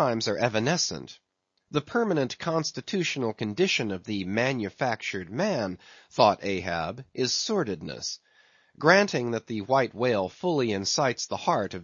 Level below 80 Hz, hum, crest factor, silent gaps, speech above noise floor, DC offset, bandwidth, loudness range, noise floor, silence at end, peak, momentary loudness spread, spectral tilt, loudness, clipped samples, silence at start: -64 dBFS; none; 24 dB; none; 35 dB; under 0.1%; 7.6 kHz; 3 LU; -62 dBFS; 0 s; -4 dBFS; 10 LU; -4 dB/octave; -27 LUFS; under 0.1%; 0 s